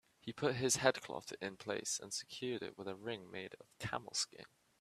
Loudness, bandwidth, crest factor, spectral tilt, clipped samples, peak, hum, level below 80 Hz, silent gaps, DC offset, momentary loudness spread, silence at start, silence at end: -40 LUFS; 15 kHz; 28 dB; -2.5 dB/octave; under 0.1%; -14 dBFS; none; -74 dBFS; none; under 0.1%; 15 LU; 0.25 s; 0.35 s